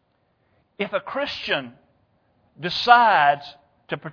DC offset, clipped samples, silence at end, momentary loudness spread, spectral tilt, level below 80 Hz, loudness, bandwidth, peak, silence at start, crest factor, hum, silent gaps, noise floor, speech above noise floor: under 0.1%; under 0.1%; 0 s; 18 LU; -4.5 dB/octave; -64 dBFS; -20 LUFS; 5.4 kHz; 0 dBFS; 0.8 s; 22 dB; none; none; -67 dBFS; 47 dB